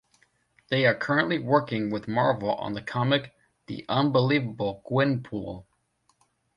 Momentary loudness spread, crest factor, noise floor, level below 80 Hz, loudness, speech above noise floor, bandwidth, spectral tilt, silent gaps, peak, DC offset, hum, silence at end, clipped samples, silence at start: 12 LU; 20 dB; -70 dBFS; -60 dBFS; -26 LUFS; 44 dB; 9.2 kHz; -7.5 dB/octave; none; -8 dBFS; under 0.1%; none; 0.95 s; under 0.1%; 0.7 s